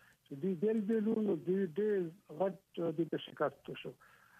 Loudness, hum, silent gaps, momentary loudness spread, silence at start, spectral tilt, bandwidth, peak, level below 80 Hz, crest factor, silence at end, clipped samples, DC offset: -36 LUFS; none; none; 13 LU; 0.3 s; -8.5 dB/octave; 14 kHz; -22 dBFS; -84 dBFS; 16 dB; 0.45 s; under 0.1%; under 0.1%